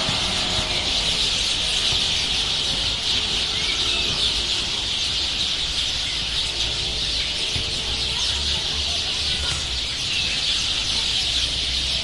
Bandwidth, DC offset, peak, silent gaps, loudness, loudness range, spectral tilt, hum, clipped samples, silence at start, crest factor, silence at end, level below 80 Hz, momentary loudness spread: 11.5 kHz; under 0.1%; -8 dBFS; none; -20 LUFS; 2 LU; -1 dB/octave; none; under 0.1%; 0 s; 16 dB; 0 s; -36 dBFS; 3 LU